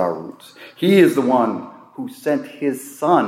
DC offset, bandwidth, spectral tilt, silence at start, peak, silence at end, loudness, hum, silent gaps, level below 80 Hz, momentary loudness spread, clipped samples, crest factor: under 0.1%; 16 kHz; -6 dB/octave; 0 s; -2 dBFS; 0 s; -18 LUFS; none; none; -72 dBFS; 20 LU; under 0.1%; 16 dB